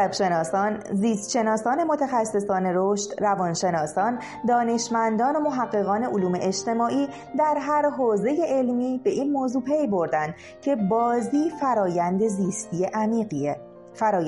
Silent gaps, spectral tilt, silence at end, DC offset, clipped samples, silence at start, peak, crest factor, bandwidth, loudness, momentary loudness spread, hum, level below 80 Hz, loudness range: none; -5.5 dB/octave; 0 s; under 0.1%; under 0.1%; 0 s; -10 dBFS; 12 dB; 11.5 kHz; -24 LUFS; 5 LU; none; -64 dBFS; 1 LU